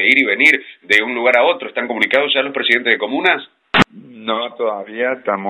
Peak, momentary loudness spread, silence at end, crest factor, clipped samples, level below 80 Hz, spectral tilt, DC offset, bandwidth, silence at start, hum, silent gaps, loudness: 0 dBFS; 10 LU; 0 s; 16 dB; 0.1%; -50 dBFS; -4 dB/octave; under 0.1%; 16.5 kHz; 0 s; none; none; -15 LUFS